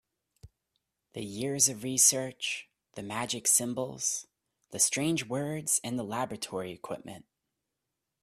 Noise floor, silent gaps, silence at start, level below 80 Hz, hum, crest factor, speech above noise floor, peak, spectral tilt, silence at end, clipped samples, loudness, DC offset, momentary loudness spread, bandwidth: -86 dBFS; none; 0.45 s; -70 dBFS; none; 24 dB; 55 dB; -8 dBFS; -2.5 dB/octave; 1 s; under 0.1%; -29 LUFS; under 0.1%; 19 LU; 15.5 kHz